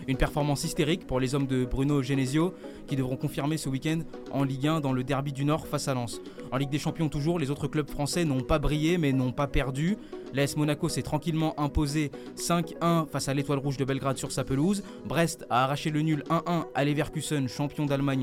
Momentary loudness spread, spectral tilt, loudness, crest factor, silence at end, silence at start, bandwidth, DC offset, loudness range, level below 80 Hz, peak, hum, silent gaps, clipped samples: 5 LU; -6 dB/octave; -29 LUFS; 18 dB; 0 s; 0 s; 16 kHz; under 0.1%; 2 LU; -42 dBFS; -10 dBFS; none; none; under 0.1%